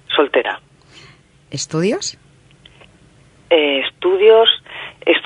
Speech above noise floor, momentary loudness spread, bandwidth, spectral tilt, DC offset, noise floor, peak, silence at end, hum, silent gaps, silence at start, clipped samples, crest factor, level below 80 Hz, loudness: 34 dB; 16 LU; 10.5 kHz; -3.5 dB/octave; under 0.1%; -49 dBFS; 0 dBFS; 0 s; none; none; 0.1 s; under 0.1%; 18 dB; -58 dBFS; -15 LUFS